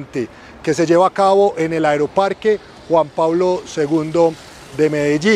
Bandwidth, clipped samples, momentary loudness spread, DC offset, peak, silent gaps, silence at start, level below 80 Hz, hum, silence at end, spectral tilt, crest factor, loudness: 12.5 kHz; under 0.1%; 12 LU; under 0.1%; -2 dBFS; none; 0 s; -52 dBFS; none; 0 s; -5.5 dB/octave; 14 dB; -16 LUFS